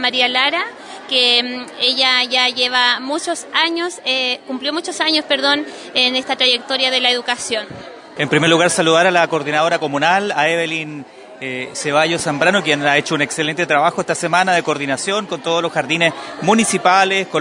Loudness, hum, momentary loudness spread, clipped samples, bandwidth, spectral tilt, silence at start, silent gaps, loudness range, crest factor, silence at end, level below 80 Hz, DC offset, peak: -15 LUFS; none; 9 LU; under 0.1%; 11 kHz; -2.5 dB/octave; 0 s; none; 2 LU; 16 dB; 0 s; -64 dBFS; under 0.1%; 0 dBFS